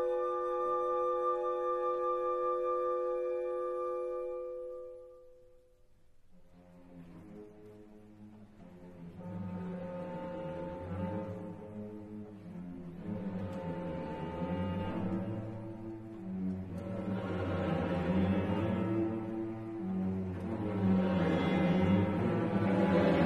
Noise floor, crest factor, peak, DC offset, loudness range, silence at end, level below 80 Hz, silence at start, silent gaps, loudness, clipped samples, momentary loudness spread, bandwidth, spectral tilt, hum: -62 dBFS; 18 dB; -18 dBFS; under 0.1%; 17 LU; 0 s; -60 dBFS; 0 s; none; -35 LUFS; under 0.1%; 21 LU; 6.4 kHz; -9 dB/octave; none